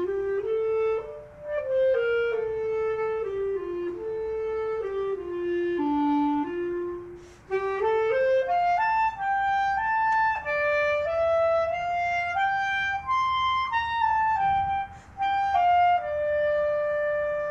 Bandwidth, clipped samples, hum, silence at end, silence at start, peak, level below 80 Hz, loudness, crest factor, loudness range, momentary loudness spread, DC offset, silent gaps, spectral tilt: 7.8 kHz; under 0.1%; none; 0 s; 0 s; -14 dBFS; -54 dBFS; -26 LUFS; 12 dB; 4 LU; 8 LU; under 0.1%; none; -5.5 dB/octave